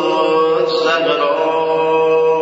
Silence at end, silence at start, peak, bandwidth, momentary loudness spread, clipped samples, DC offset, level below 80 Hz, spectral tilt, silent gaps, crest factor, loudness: 0 s; 0 s; -2 dBFS; 8 kHz; 2 LU; under 0.1%; under 0.1%; -64 dBFS; -4.5 dB/octave; none; 12 dB; -14 LUFS